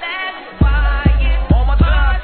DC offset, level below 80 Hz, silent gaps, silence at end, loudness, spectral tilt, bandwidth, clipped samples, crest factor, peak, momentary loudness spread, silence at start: under 0.1%; -14 dBFS; none; 0 s; -16 LUFS; -10.5 dB/octave; 4.4 kHz; under 0.1%; 14 dB; 0 dBFS; 8 LU; 0 s